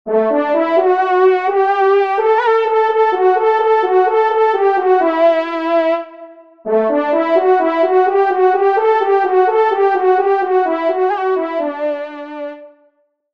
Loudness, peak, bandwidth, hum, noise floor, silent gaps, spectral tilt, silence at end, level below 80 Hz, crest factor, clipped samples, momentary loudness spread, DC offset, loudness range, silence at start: -14 LUFS; 0 dBFS; 6 kHz; none; -58 dBFS; none; -6 dB/octave; 0.65 s; -68 dBFS; 12 dB; under 0.1%; 7 LU; 0.3%; 2 LU; 0.05 s